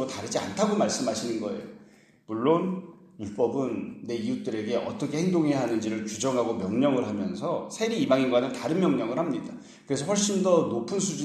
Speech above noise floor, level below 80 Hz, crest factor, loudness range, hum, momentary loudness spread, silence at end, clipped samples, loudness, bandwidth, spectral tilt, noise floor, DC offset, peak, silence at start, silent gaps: 26 dB; -68 dBFS; 18 dB; 4 LU; none; 10 LU; 0 s; under 0.1%; -27 LUFS; 13 kHz; -5 dB/octave; -53 dBFS; under 0.1%; -8 dBFS; 0 s; none